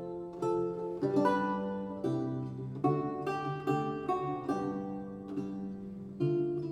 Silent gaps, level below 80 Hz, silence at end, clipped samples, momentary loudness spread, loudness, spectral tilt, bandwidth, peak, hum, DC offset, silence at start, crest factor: none; -66 dBFS; 0 s; under 0.1%; 10 LU; -34 LUFS; -8.5 dB/octave; 11.5 kHz; -16 dBFS; none; under 0.1%; 0 s; 18 dB